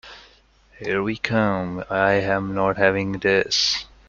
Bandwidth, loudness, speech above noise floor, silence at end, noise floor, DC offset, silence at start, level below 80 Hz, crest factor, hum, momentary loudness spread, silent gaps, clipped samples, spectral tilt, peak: 7.6 kHz; -21 LUFS; 33 dB; 0.25 s; -55 dBFS; under 0.1%; 0.05 s; -50 dBFS; 20 dB; none; 7 LU; none; under 0.1%; -4 dB/octave; -2 dBFS